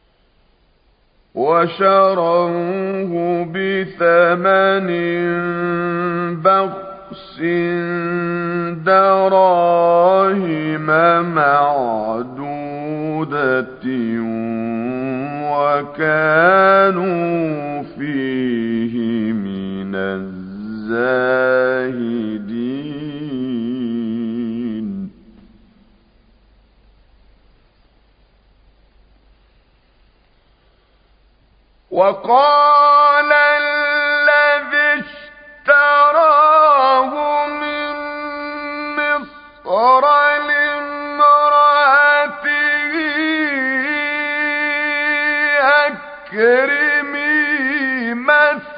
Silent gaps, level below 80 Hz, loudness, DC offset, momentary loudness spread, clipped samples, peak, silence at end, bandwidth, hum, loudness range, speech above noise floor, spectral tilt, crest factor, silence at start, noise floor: none; -56 dBFS; -15 LUFS; under 0.1%; 14 LU; under 0.1%; 0 dBFS; 0 s; 5.2 kHz; none; 9 LU; 42 dB; -10.5 dB/octave; 16 dB; 1.35 s; -56 dBFS